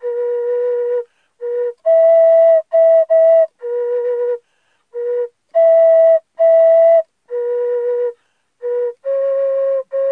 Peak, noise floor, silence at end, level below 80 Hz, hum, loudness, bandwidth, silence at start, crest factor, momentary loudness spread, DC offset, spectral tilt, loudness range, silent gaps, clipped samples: -6 dBFS; -64 dBFS; 0 s; -84 dBFS; none; -14 LUFS; 3 kHz; 0 s; 8 dB; 14 LU; under 0.1%; -3 dB/octave; 3 LU; none; under 0.1%